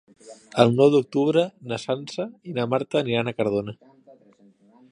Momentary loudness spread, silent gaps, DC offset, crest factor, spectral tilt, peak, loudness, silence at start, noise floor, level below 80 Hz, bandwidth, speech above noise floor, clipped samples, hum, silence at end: 13 LU; none; under 0.1%; 24 dB; -6.5 dB/octave; 0 dBFS; -23 LUFS; 0.25 s; -56 dBFS; -64 dBFS; 10.5 kHz; 34 dB; under 0.1%; none; 1.15 s